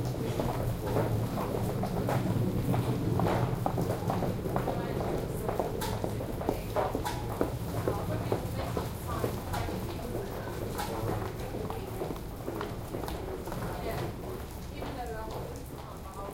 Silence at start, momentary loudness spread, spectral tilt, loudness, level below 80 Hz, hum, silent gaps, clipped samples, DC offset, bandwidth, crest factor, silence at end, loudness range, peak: 0 s; 8 LU; -6.5 dB/octave; -34 LUFS; -44 dBFS; none; none; under 0.1%; under 0.1%; 17 kHz; 22 dB; 0 s; 7 LU; -10 dBFS